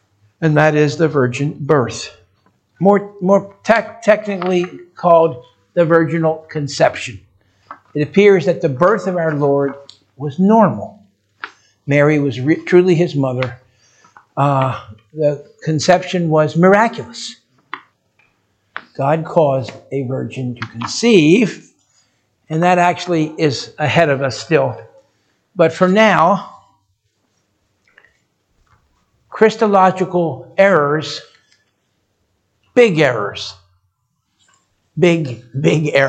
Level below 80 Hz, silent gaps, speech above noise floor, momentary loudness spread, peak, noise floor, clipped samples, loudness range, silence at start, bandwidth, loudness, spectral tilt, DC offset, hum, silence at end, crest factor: -60 dBFS; none; 53 dB; 17 LU; 0 dBFS; -68 dBFS; under 0.1%; 4 LU; 0.4 s; 9 kHz; -15 LUFS; -6 dB/octave; under 0.1%; none; 0 s; 16 dB